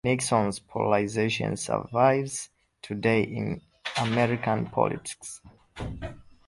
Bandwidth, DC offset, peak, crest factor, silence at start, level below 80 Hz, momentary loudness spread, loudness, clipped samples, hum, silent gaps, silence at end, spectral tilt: 11.5 kHz; under 0.1%; -6 dBFS; 20 dB; 0.05 s; -52 dBFS; 16 LU; -27 LUFS; under 0.1%; none; none; 0.25 s; -5 dB/octave